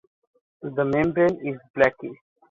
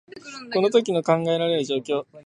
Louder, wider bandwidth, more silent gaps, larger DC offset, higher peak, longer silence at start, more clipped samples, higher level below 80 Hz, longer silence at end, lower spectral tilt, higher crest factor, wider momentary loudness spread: about the same, -23 LUFS vs -22 LUFS; second, 7.2 kHz vs 10.5 kHz; first, 1.70-1.74 s vs none; neither; about the same, -4 dBFS vs -4 dBFS; first, 0.6 s vs 0.15 s; neither; first, -56 dBFS vs -70 dBFS; first, 0.35 s vs 0.05 s; first, -8 dB/octave vs -5.5 dB/octave; about the same, 22 dB vs 18 dB; first, 17 LU vs 10 LU